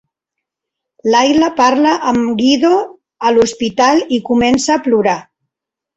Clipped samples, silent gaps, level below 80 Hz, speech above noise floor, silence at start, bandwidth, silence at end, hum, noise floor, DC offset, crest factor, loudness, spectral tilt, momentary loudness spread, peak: under 0.1%; none; -48 dBFS; 70 dB; 1.05 s; 8.2 kHz; 0.75 s; none; -82 dBFS; under 0.1%; 12 dB; -13 LUFS; -4 dB/octave; 6 LU; 0 dBFS